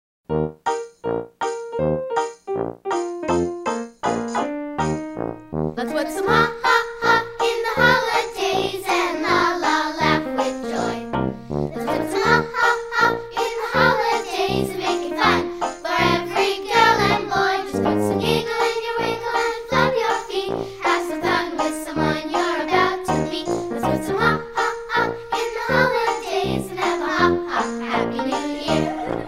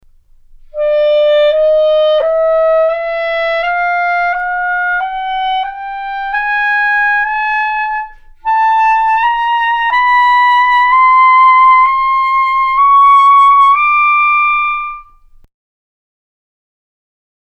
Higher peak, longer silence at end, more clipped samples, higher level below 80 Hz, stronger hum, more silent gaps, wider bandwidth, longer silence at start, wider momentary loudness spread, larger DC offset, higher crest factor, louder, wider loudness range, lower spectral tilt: about the same, 0 dBFS vs 0 dBFS; second, 0 s vs 2.5 s; neither; about the same, -46 dBFS vs -42 dBFS; neither; neither; first, 16 kHz vs 8.2 kHz; second, 0.3 s vs 0.75 s; second, 8 LU vs 12 LU; neither; first, 20 dB vs 10 dB; second, -21 LUFS vs -10 LUFS; about the same, 5 LU vs 7 LU; first, -4.5 dB/octave vs -0.5 dB/octave